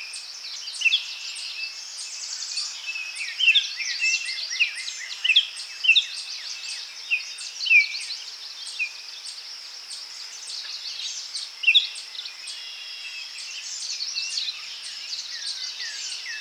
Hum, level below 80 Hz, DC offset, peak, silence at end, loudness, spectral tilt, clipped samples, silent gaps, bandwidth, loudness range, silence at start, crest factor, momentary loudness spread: none; under -90 dBFS; under 0.1%; -6 dBFS; 0 s; -24 LUFS; 6 dB/octave; under 0.1%; none; 19.5 kHz; 9 LU; 0 s; 20 dB; 16 LU